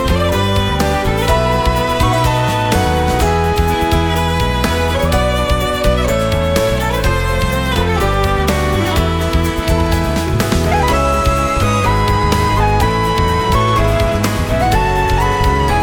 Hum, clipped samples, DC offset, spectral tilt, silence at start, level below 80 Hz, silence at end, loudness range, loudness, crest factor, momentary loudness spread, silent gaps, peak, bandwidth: none; under 0.1%; under 0.1%; -5.5 dB/octave; 0 s; -20 dBFS; 0 s; 1 LU; -14 LUFS; 14 dB; 2 LU; none; 0 dBFS; 19 kHz